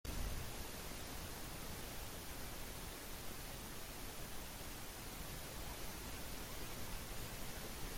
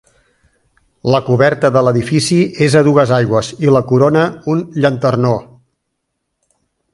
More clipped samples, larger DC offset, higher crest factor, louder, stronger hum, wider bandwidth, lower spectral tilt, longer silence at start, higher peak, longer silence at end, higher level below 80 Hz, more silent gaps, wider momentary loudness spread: neither; neither; about the same, 16 dB vs 14 dB; second, -48 LUFS vs -13 LUFS; neither; first, 16.5 kHz vs 11.5 kHz; second, -3 dB/octave vs -6.5 dB/octave; second, 0.05 s vs 1.05 s; second, -32 dBFS vs 0 dBFS; second, 0 s vs 1.5 s; about the same, -52 dBFS vs -48 dBFS; neither; second, 1 LU vs 5 LU